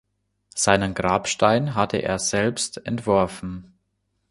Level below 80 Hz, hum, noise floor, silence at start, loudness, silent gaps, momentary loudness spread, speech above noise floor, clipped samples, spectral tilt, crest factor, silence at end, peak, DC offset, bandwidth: -48 dBFS; none; -73 dBFS; 0.55 s; -22 LUFS; none; 13 LU; 51 dB; under 0.1%; -4 dB/octave; 22 dB; 0.7 s; -2 dBFS; under 0.1%; 11.5 kHz